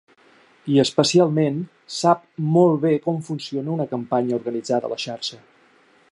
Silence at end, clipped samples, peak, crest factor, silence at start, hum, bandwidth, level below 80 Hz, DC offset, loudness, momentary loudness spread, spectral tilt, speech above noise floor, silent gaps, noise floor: 0.75 s; under 0.1%; -2 dBFS; 18 dB; 0.65 s; none; 11.5 kHz; -68 dBFS; under 0.1%; -21 LUFS; 11 LU; -6 dB/octave; 36 dB; none; -56 dBFS